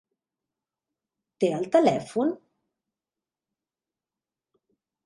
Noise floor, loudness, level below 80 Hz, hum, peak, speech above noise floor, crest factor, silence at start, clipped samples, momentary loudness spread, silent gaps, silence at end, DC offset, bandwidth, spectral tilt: under -90 dBFS; -25 LUFS; -74 dBFS; none; -8 dBFS; over 67 dB; 22 dB; 1.4 s; under 0.1%; 7 LU; none; 2.7 s; under 0.1%; 11.5 kHz; -6.5 dB/octave